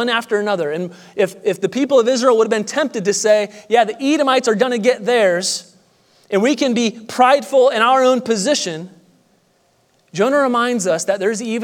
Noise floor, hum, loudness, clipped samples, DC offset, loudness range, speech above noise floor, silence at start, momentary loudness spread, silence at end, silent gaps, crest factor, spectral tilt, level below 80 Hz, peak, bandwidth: -59 dBFS; none; -16 LUFS; under 0.1%; under 0.1%; 2 LU; 43 dB; 0 s; 8 LU; 0 s; none; 16 dB; -3.5 dB/octave; -76 dBFS; 0 dBFS; 16 kHz